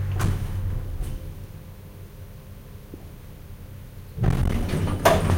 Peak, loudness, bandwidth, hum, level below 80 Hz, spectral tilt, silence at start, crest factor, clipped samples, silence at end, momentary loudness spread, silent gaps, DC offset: -4 dBFS; -26 LUFS; 17 kHz; none; -32 dBFS; -6 dB/octave; 0 s; 22 dB; under 0.1%; 0 s; 21 LU; none; under 0.1%